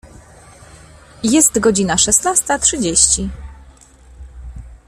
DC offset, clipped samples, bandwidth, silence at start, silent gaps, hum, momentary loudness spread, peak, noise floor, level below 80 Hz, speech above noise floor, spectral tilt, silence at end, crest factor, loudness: under 0.1%; under 0.1%; 16 kHz; 0.05 s; none; none; 24 LU; 0 dBFS; -43 dBFS; -36 dBFS; 29 dB; -2.5 dB/octave; 0.1 s; 18 dB; -13 LUFS